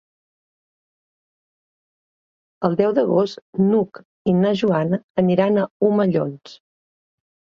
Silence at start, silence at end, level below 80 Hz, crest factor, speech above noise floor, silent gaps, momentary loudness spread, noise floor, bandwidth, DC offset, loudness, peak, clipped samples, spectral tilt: 2.6 s; 1 s; -62 dBFS; 18 dB; over 71 dB; 3.42-3.53 s, 4.05-4.25 s, 5.03-5.15 s, 5.71-5.80 s; 7 LU; under -90 dBFS; 7 kHz; under 0.1%; -20 LUFS; -4 dBFS; under 0.1%; -8.5 dB/octave